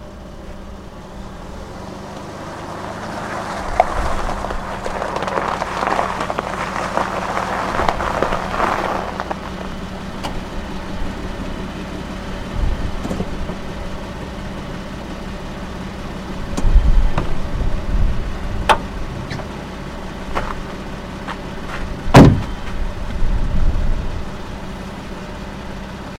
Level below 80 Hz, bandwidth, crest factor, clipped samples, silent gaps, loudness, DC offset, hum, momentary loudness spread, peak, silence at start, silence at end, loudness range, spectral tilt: -24 dBFS; 13.5 kHz; 20 dB; under 0.1%; none; -22 LUFS; under 0.1%; none; 12 LU; 0 dBFS; 0 s; 0 s; 11 LU; -6 dB/octave